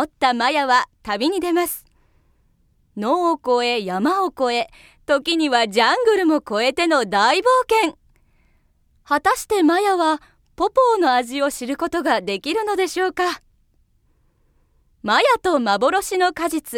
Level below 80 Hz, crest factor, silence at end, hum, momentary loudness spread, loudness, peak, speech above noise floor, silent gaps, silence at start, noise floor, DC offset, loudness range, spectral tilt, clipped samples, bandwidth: -56 dBFS; 18 dB; 0 s; none; 8 LU; -19 LUFS; -2 dBFS; 42 dB; none; 0 s; -61 dBFS; under 0.1%; 5 LU; -3 dB/octave; under 0.1%; 18 kHz